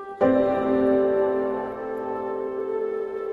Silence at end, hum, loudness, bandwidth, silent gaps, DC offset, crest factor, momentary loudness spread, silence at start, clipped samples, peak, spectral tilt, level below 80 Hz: 0 s; none; -24 LUFS; 4.7 kHz; none; under 0.1%; 16 dB; 9 LU; 0 s; under 0.1%; -8 dBFS; -8.5 dB/octave; -56 dBFS